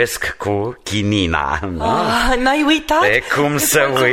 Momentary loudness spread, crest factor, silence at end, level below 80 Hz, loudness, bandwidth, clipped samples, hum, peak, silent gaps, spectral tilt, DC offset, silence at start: 7 LU; 16 dB; 0 s; -32 dBFS; -16 LUFS; 16.5 kHz; under 0.1%; none; 0 dBFS; none; -3.5 dB/octave; under 0.1%; 0 s